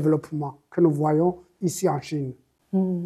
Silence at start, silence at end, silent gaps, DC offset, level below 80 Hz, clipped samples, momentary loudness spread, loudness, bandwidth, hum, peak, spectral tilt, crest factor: 0 s; 0 s; none; under 0.1%; -64 dBFS; under 0.1%; 10 LU; -25 LUFS; 13.5 kHz; none; -6 dBFS; -7.5 dB/octave; 18 dB